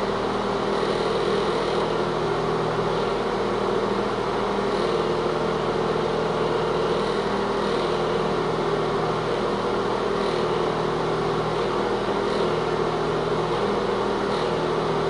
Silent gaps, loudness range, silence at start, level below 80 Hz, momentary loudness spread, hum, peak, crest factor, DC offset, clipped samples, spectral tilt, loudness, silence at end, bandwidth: none; 0 LU; 0 s; -46 dBFS; 1 LU; none; -12 dBFS; 12 dB; under 0.1%; under 0.1%; -6 dB/octave; -24 LUFS; 0 s; 11.5 kHz